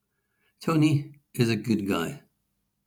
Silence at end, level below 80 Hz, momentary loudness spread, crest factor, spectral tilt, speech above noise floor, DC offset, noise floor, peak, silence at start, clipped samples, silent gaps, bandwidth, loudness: 0.7 s; -66 dBFS; 13 LU; 20 dB; -6.5 dB/octave; 52 dB; under 0.1%; -76 dBFS; -8 dBFS; 0.6 s; under 0.1%; none; 19.5 kHz; -26 LUFS